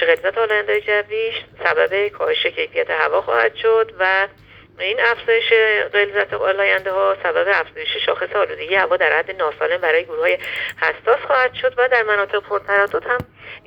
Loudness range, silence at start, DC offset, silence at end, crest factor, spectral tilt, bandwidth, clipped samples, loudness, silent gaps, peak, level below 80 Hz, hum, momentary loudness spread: 2 LU; 0 s; under 0.1%; 0.1 s; 18 dB; -4 dB/octave; 17.5 kHz; under 0.1%; -18 LUFS; none; 0 dBFS; -56 dBFS; none; 6 LU